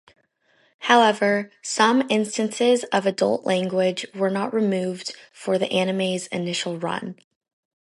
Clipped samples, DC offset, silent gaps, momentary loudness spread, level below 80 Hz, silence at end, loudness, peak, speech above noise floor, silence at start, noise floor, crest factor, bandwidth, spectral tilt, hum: under 0.1%; under 0.1%; none; 10 LU; -72 dBFS; 0.7 s; -22 LUFS; -2 dBFS; 41 dB; 0.8 s; -63 dBFS; 20 dB; 11.5 kHz; -4 dB/octave; none